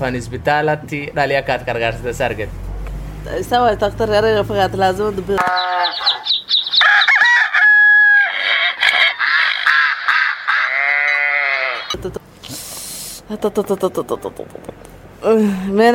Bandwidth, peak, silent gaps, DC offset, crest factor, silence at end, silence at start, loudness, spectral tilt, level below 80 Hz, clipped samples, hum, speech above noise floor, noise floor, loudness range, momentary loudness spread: 17 kHz; 0 dBFS; none; under 0.1%; 16 dB; 0 s; 0 s; -14 LUFS; -3.5 dB/octave; -38 dBFS; under 0.1%; none; 21 dB; -38 dBFS; 10 LU; 18 LU